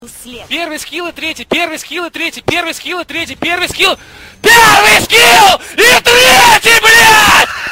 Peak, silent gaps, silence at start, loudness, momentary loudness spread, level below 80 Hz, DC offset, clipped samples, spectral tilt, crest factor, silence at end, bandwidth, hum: 0 dBFS; none; 0 s; -6 LUFS; 16 LU; -38 dBFS; under 0.1%; 1%; -1 dB/octave; 10 dB; 0 s; over 20 kHz; none